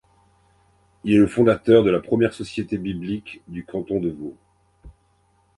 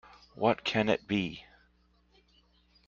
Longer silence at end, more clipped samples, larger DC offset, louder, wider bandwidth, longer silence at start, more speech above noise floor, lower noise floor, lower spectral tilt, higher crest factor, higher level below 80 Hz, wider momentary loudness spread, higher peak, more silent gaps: second, 0.7 s vs 1.45 s; neither; neither; first, -21 LUFS vs -30 LUFS; first, 11.5 kHz vs 7.6 kHz; first, 1.05 s vs 0.4 s; first, 42 dB vs 38 dB; second, -62 dBFS vs -68 dBFS; first, -7.5 dB/octave vs -6 dB/octave; about the same, 20 dB vs 24 dB; first, -50 dBFS vs -64 dBFS; first, 18 LU vs 9 LU; first, -4 dBFS vs -10 dBFS; neither